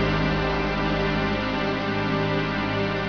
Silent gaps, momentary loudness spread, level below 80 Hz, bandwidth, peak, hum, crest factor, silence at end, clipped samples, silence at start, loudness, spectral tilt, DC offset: none; 2 LU; -36 dBFS; 5.4 kHz; -12 dBFS; none; 12 dB; 0 s; under 0.1%; 0 s; -24 LUFS; -7 dB/octave; 0.3%